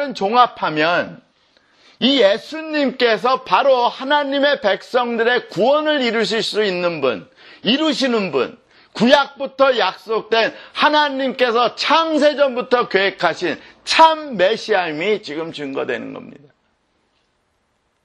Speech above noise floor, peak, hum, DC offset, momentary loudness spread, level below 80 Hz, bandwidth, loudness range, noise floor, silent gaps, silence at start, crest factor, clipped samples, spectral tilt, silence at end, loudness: 49 dB; 0 dBFS; none; under 0.1%; 10 LU; -64 dBFS; 11.5 kHz; 3 LU; -66 dBFS; none; 0 s; 18 dB; under 0.1%; -4 dB/octave; 1.75 s; -17 LUFS